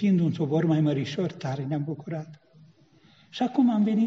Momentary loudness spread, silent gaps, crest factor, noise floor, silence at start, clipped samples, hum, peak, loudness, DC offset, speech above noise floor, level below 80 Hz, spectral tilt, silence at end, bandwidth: 14 LU; none; 14 dB; -58 dBFS; 0 s; under 0.1%; none; -12 dBFS; -26 LUFS; under 0.1%; 34 dB; -70 dBFS; -7.5 dB/octave; 0 s; 7.6 kHz